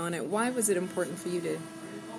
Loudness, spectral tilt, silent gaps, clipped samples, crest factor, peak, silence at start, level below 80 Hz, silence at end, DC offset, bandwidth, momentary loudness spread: -31 LUFS; -4 dB/octave; none; under 0.1%; 16 dB; -16 dBFS; 0 s; -76 dBFS; 0 s; under 0.1%; 16 kHz; 12 LU